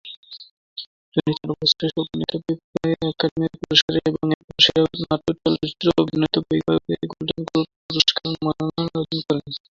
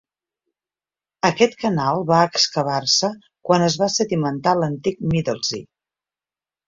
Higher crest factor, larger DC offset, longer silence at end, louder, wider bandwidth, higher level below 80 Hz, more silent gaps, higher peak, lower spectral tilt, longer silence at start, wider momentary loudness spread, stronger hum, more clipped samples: about the same, 22 dB vs 20 dB; neither; second, 0.15 s vs 1.05 s; about the same, -21 LUFS vs -19 LUFS; about the same, 7.6 kHz vs 7.6 kHz; about the same, -52 dBFS vs -54 dBFS; first, 0.17-0.23 s, 0.51-0.76 s, 0.87-1.12 s, 2.64-2.73 s, 3.31-3.36 s, 3.82-3.88 s, 4.34-4.48 s, 7.76-7.89 s vs none; about the same, 0 dBFS vs -2 dBFS; about the same, -5 dB/octave vs -4 dB/octave; second, 0.05 s vs 1.25 s; first, 11 LU vs 7 LU; neither; neither